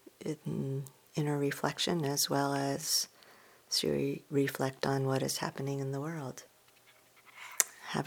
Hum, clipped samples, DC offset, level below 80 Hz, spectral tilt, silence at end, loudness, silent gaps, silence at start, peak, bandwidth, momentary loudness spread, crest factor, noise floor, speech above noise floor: none; under 0.1%; under 0.1%; -70 dBFS; -4 dB/octave; 0 s; -33 LUFS; none; 0.2 s; 0 dBFS; over 20 kHz; 11 LU; 34 dB; -63 dBFS; 30 dB